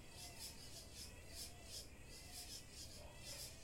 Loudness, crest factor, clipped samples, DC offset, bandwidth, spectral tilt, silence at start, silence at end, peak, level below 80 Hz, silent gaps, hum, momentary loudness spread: -53 LUFS; 18 dB; under 0.1%; under 0.1%; 16.5 kHz; -2 dB/octave; 0 s; 0 s; -38 dBFS; -64 dBFS; none; none; 4 LU